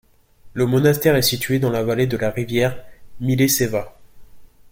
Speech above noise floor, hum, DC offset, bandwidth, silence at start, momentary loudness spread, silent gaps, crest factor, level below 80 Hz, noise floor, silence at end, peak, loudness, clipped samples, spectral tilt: 28 dB; none; under 0.1%; 16.5 kHz; 0.45 s; 11 LU; none; 18 dB; -48 dBFS; -47 dBFS; 0.25 s; -4 dBFS; -19 LUFS; under 0.1%; -5 dB/octave